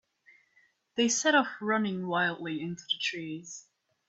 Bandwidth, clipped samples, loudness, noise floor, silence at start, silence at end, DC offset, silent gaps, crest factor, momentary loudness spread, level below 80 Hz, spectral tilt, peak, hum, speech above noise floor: 8.4 kHz; under 0.1%; -29 LUFS; -68 dBFS; 0.95 s; 0.5 s; under 0.1%; none; 20 dB; 15 LU; -78 dBFS; -3 dB/octave; -12 dBFS; none; 38 dB